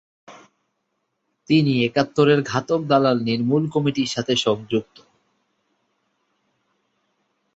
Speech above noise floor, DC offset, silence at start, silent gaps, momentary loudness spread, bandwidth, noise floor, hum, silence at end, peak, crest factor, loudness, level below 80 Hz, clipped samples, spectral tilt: 55 dB; under 0.1%; 0.3 s; none; 6 LU; 8 kHz; -74 dBFS; none; 2.75 s; -4 dBFS; 20 dB; -20 LUFS; -62 dBFS; under 0.1%; -6 dB/octave